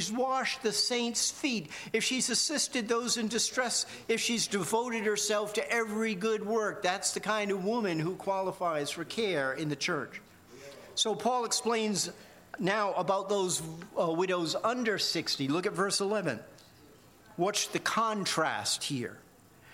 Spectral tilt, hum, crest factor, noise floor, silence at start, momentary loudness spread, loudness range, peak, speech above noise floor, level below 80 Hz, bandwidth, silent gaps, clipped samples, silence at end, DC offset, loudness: -2.5 dB/octave; none; 18 dB; -57 dBFS; 0 s; 6 LU; 3 LU; -14 dBFS; 26 dB; -74 dBFS; 16.5 kHz; none; under 0.1%; 0 s; under 0.1%; -30 LUFS